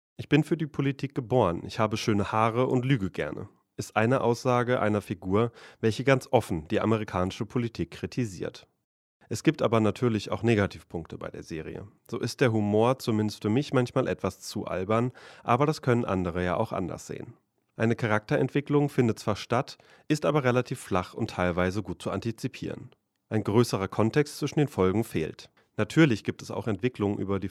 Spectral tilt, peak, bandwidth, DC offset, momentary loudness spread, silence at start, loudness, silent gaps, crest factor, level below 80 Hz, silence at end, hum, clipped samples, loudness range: -6.5 dB/octave; -6 dBFS; 14.5 kHz; under 0.1%; 13 LU; 0.2 s; -28 LUFS; 8.84-9.20 s; 22 dB; -58 dBFS; 0 s; none; under 0.1%; 3 LU